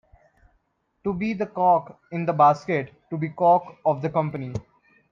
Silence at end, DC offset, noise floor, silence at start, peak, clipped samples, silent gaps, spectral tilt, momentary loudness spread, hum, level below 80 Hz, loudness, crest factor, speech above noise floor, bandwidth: 0.5 s; under 0.1%; -70 dBFS; 1.05 s; -6 dBFS; under 0.1%; none; -8.5 dB/octave; 14 LU; none; -58 dBFS; -23 LUFS; 18 dB; 47 dB; 7.4 kHz